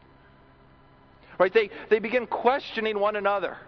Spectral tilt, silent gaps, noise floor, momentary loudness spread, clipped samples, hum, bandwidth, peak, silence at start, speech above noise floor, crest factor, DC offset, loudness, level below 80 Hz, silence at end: -6 dB/octave; none; -55 dBFS; 5 LU; under 0.1%; none; 6.2 kHz; -6 dBFS; 1.3 s; 30 dB; 20 dB; under 0.1%; -25 LUFS; -62 dBFS; 0.05 s